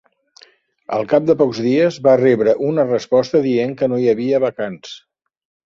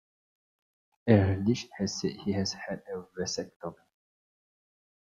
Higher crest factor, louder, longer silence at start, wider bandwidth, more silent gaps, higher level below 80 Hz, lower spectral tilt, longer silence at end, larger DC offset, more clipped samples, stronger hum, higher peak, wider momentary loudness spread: second, 16 dB vs 24 dB; first, -16 LUFS vs -30 LUFS; second, 0.9 s vs 1.05 s; about the same, 7.4 kHz vs 7.6 kHz; second, none vs 3.56-3.60 s; about the same, -60 dBFS vs -64 dBFS; first, -7 dB/octave vs -5.5 dB/octave; second, 0.7 s vs 1.4 s; neither; neither; neither; first, 0 dBFS vs -8 dBFS; second, 12 LU vs 17 LU